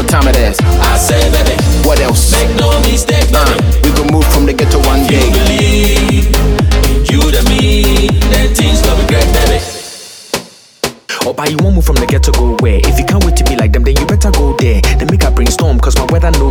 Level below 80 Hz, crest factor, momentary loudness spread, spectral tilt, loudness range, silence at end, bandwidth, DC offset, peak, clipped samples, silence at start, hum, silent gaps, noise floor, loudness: -12 dBFS; 8 dB; 4 LU; -5 dB/octave; 4 LU; 0 s; over 20 kHz; under 0.1%; 0 dBFS; under 0.1%; 0 s; none; none; -29 dBFS; -10 LUFS